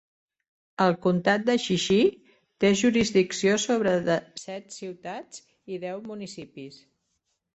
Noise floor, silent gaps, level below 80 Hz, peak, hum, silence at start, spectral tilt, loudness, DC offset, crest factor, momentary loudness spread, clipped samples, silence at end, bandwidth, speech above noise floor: -77 dBFS; none; -62 dBFS; -8 dBFS; none; 0.8 s; -4.5 dB/octave; -24 LUFS; under 0.1%; 20 dB; 19 LU; under 0.1%; 0.8 s; 8.2 kHz; 52 dB